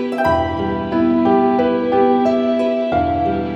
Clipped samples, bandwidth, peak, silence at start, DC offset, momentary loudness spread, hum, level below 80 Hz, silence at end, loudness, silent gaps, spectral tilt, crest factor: under 0.1%; 7.2 kHz; -2 dBFS; 0 s; under 0.1%; 5 LU; none; -40 dBFS; 0 s; -16 LUFS; none; -8 dB/octave; 14 dB